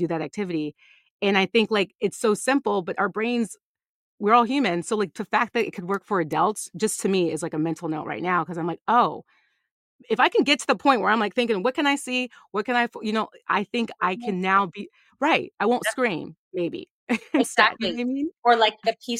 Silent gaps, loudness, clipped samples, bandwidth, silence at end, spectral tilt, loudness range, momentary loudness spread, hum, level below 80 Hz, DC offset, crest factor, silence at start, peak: 1.10-1.19 s, 3.63-3.75 s, 3.89-4.18 s, 8.81-8.86 s, 9.71-9.99 s, 16.38-16.51 s, 16.91-17.07 s, 18.38-18.42 s; -23 LUFS; under 0.1%; 15.5 kHz; 0 s; -4 dB/octave; 3 LU; 10 LU; none; -70 dBFS; under 0.1%; 22 dB; 0 s; -2 dBFS